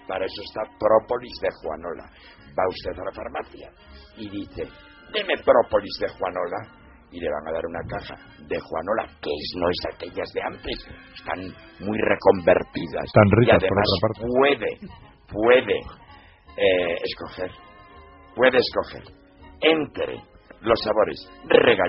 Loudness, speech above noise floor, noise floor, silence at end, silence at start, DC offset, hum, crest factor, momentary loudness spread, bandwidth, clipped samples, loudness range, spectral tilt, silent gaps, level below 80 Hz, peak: -23 LUFS; 25 dB; -48 dBFS; 0 s; 0.1 s; under 0.1%; none; 22 dB; 18 LU; 5.8 kHz; under 0.1%; 10 LU; -3.5 dB/octave; none; -48 dBFS; -2 dBFS